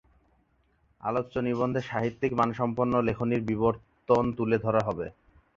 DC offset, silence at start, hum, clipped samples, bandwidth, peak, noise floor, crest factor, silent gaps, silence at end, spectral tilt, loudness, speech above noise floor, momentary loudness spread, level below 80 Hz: under 0.1%; 1.05 s; none; under 0.1%; 7.4 kHz; -8 dBFS; -68 dBFS; 20 dB; none; 0.45 s; -8.5 dB/octave; -28 LUFS; 41 dB; 7 LU; -54 dBFS